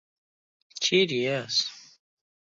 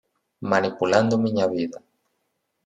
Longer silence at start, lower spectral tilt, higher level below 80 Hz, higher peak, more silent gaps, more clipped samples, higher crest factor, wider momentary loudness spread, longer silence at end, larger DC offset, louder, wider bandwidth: first, 0.75 s vs 0.4 s; second, -3 dB/octave vs -6 dB/octave; second, -78 dBFS vs -68 dBFS; second, -10 dBFS vs -4 dBFS; neither; neither; about the same, 20 dB vs 20 dB; about the same, 11 LU vs 11 LU; second, 0.6 s vs 0.9 s; neither; second, -25 LUFS vs -22 LUFS; second, 7.8 kHz vs 9.4 kHz